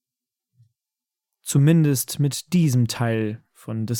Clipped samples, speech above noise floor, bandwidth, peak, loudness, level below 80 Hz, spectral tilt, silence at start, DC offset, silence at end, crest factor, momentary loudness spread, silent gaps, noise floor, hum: under 0.1%; 68 dB; 18 kHz; -6 dBFS; -21 LUFS; -62 dBFS; -6 dB/octave; 1.45 s; under 0.1%; 0 s; 16 dB; 14 LU; none; -88 dBFS; none